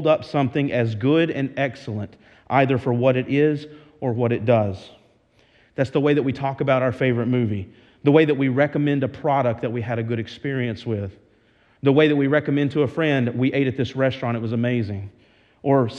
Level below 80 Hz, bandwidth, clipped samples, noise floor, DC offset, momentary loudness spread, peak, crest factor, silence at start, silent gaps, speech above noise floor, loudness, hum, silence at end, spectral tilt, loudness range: -60 dBFS; 7.8 kHz; under 0.1%; -58 dBFS; under 0.1%; 11 LU; -2 dBFS; 20 dB; 0 s; none; 38 dB; -21 LUFS; none; 0 s; -8.5 dB/octave; 3 LU